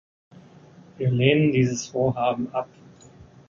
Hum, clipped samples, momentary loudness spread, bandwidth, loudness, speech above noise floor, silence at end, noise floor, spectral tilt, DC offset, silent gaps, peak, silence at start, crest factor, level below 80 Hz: none; under 0.1%; 11 LU; 7.6 kHz; -23 LUFS; 27 dB; 0.25 s; -49 dBFS; -6 dB/octave; under 0.1%; none; -4 dBFS; 1 s; 22 dB; -58 dBFS